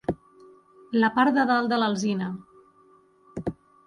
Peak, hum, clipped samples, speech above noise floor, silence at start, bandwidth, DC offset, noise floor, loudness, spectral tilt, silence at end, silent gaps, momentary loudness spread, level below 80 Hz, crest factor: -10 dBFS; none; under 0.1%; 35 dB; 0.1 s; 11 kHz; under 0.1%; -58 dBFS; -25 LUFS; -5.5 dB/octave; 0.35 s; none; 17 LU; -56 dBFS; 16 dB